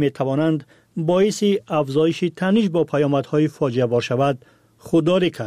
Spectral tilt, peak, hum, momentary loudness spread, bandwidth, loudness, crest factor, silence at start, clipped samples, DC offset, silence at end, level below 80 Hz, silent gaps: -6.5 dB/octave; -8 dBFS; none; 4 LU; 14.5 kHz; -20 LUFS; 12 dB; 0 s; under 0.1%; under 0.1%; 0 s; -60 dBFS; none